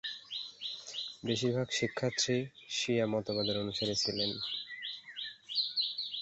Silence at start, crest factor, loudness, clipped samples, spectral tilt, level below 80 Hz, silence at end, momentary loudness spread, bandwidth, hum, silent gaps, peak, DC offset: 0.05 s; 18 dB; -34 LUFS; under 0.1%; -3 dB/octave; -68 dBFS; 0 s; 9 LU; 8 kHz; none; none; -18 dBFS; under 0.1%